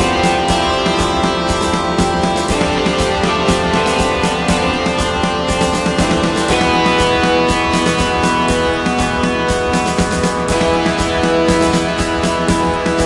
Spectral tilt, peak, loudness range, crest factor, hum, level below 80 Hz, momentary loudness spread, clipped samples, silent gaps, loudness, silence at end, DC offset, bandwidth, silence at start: -4.5 dB/octave; 0 dBFS; 1 LU; 14 dB; none; -30 dBFS; 3 LU; under 0.1%; none; -14 LUFS; 0 s; under 0.1%; 11.5 kHz; 0 s